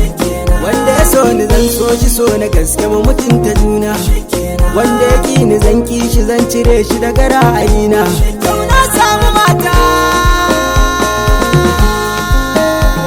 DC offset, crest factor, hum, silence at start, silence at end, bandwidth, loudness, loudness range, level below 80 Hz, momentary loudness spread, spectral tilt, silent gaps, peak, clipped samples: under 0.1%; 10 dB; none; 0 s; 0 s; 17.5 kHz; -11 LUFS; 2 LU; -14 dBFS; 5 LU; -5 dB/octave; none; 0 dBFS; under 0.1%